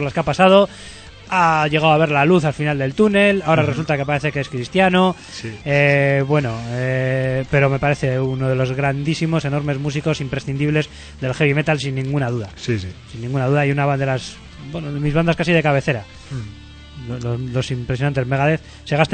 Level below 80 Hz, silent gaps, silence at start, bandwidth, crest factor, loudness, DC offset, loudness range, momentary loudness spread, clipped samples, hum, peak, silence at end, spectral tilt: -42 dBFS; none; 0 s; 9.2 kHz; 18 dB; -18 LUFS; under 0.1%; 5 LU; 14 LU; under 0.1%; none; 0 dBFS; 0 s; -6.5 dB/octave